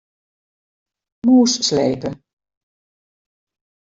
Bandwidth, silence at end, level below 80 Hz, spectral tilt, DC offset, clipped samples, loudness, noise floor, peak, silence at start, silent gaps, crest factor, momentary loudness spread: 7.8 kHz; 1.8 s; -60 dBFS; -4 dB/octave; under 0.1%; under 0.1%; -16 LUFS; under -90 dBFS; -4 dBFS; 1.25 s; none; 18 dB; 12 LU